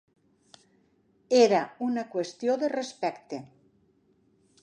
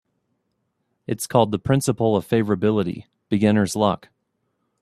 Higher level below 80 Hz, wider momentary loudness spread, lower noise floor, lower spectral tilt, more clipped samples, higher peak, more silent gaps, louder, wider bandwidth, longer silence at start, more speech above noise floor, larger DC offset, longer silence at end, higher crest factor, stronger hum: second, -80 dBFS vs -54 dBFS; first, 17 LU vs 11 LU; second, -66 dBFS vs -73 dBFS; second, -4.5 dB/octave vs -6 dB/octave; neither; second, -8 dBFS vs -2 dBFS; neither; second, -27 LUFS vs -21 LUFS; second, 10 kHz vs 14 kHz; first, 1.3 s vs 1.1 s; second, 40 dB vs 53 dB; neither; first, 1.2 s vs 0.85 s; about the same, 22 dB vs 20 dB; neither